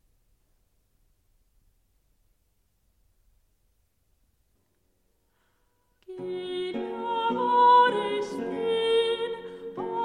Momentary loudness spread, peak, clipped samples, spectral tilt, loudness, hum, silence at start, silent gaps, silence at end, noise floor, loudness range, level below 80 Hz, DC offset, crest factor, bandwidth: 18 LU; -10 dBFS; under 0.1%; -4.5 dB/octave; -25 LUFS; none; 6.1 s; none; 0 s; -72 dBFS; 15 LU; -68 dBFS; under 0.1%; 20 dB; 10.5 kHz